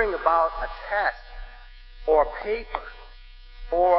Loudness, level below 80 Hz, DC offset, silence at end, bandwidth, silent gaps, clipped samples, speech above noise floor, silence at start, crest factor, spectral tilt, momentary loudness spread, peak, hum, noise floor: -25 LUFS; -40 dBFS; under 0.1%; 0 s; 5.8 kHz; none; under 0.1%; 21 dB; 0 s; 20 dB; -7.5 dB/octave; 22 LU; -6 dBFS; none; -44 dBFS